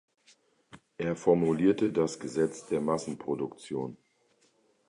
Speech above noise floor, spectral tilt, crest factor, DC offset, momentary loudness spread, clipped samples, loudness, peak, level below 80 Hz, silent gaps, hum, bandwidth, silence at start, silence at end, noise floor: 40 dB; -6.5 dB/octave; 20 dB; under 0.1%; 11 LU; under 0.1%; -30 LUFS; -12 dBFS; -64 dBFS; none; none; 11 kHz; 0.75 s; 0.95 s; -69 dBFS